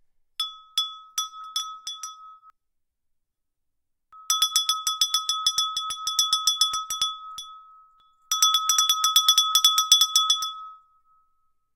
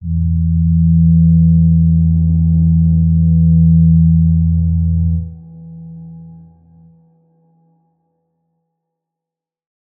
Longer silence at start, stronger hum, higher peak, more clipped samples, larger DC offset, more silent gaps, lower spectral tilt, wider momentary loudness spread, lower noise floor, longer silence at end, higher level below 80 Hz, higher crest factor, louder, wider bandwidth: first, 0.4 s vs 0 s; neither; about the same, -2 dBFS vs -2 dBFS; neither; neither; neither; second, 5 dB/octave vs -19.5 dB/octave; first, 18 LU vs 14 LU; second, -77 dBFS vs -86 dBFS; second, 1 s vs 3.65 s; second, -68 dBFS vs -28 dBFS; first, 26 dB vs 10 dB; second, -21 LUFS vs -12 LUFS; first, 17.5 kHz vs 0.9 kHz